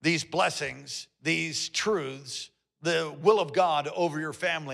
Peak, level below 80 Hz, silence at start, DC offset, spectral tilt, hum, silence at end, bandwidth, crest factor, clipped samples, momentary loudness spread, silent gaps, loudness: -10 dBFS; -72 dBFS; 0 s; under 0.1%; -3.5 dB/octave; none; 0 s; 13.5 kHz; 20 dB; under 0.1%; 13 LU; none; -28 LUFS